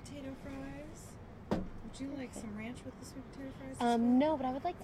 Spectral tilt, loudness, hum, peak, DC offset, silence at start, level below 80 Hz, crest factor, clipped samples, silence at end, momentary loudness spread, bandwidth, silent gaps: -6 dB/octave; -36 LUFS; none; -20 dBFS; under 0.1%; 0 s; -54 dBFS; 18 dB; under 0.1%; 0 s; 19 LU; 13 kHz; none